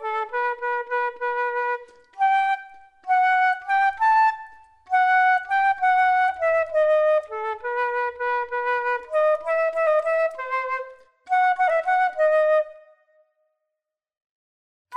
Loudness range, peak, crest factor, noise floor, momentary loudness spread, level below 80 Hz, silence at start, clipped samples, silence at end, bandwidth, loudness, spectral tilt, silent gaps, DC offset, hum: 3 LU; -10 dBFS; 12 dB; -85 dBFS; 9 LU; -66 dBFS; 0 s; under 0.1%; 0 s; 9.4 kHz; -22 LUFS; -1 dB/octave; 14.26-14.85 s; under 0.1%; none